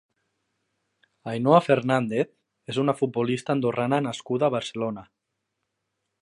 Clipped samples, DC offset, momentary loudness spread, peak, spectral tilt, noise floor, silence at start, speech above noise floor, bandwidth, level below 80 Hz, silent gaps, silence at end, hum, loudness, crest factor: under 0.1%; under 0.1%; 12 LU; -4 dBFS; -6.5 dB/octave; -80 dBFS; 1.25 s; 56 dB; 11.5 kHz; -70 dBFS; none; 1.2 s; none; -25 LUFS; 22 dB